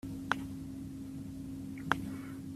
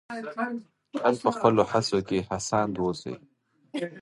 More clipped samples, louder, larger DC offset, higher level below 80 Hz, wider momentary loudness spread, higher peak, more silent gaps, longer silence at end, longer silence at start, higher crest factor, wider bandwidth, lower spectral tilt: neither; second, -40 LUFS vs -27 LUFS; neither; about the same, -58 dBFS vs -58 dBFS; second, 8 LU vs 15 LU; about the same, -8 dBFS vs -6 dBFS; neither; about the same, 0 s vs 0 s; about the same, 0.05 s vs 0.1 s; first, 32 dB vs 22 dB; first, 14.5 kHz vs 11.5 kHz; about the same, -5.5 dB/octave vs -5 dB/octave